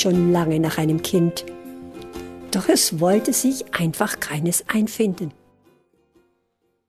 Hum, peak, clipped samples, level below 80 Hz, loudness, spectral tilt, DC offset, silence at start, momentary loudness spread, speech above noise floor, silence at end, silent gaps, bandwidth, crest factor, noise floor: none; -4 dBFS; under 0.1%; -54 dBFS; -20 LUFS; -4.5 dB/octave; under 0.1%; 0 s; 18 LU; 50 dB; 1.6 s; none; 14.5 kHz; 18 dB; -70 dBFS